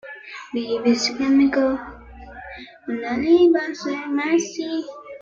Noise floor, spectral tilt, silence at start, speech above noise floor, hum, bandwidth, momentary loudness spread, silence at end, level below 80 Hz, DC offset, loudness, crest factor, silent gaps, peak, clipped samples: -40 dBFS; -4 dB/octave; 0.05 s; 20 dB; none; 7.6 kHz; 21 LU; 0.05 s; -52 dBFS; under 0.1%; -21 LUFS; 16 dB; none; -6 dBFS; under 0.1%